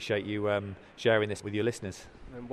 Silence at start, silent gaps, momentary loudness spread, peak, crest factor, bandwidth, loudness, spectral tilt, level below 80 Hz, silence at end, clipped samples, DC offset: 0 s; none; 19 LU; -12 dBFS; 20 dB; 13.5 kHz; -30 LUFS; -5.5 dB/octave; -58 dBFS; 0 s; under 0.1%; under 0.1%